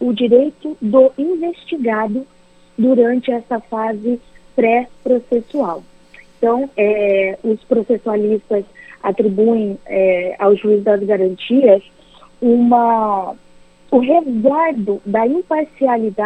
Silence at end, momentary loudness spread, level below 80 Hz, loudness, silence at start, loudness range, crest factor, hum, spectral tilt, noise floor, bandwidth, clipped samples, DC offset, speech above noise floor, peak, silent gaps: 0 s; 9 LU; -54 dBFS; -16 LUFS; 0 s; 4 LU; 16 dB; none; -8 dB/octave; -44 dBFS; 8.4 kHz; under 0.1%; under 0.1%; 29 dB; 0 dBFS; none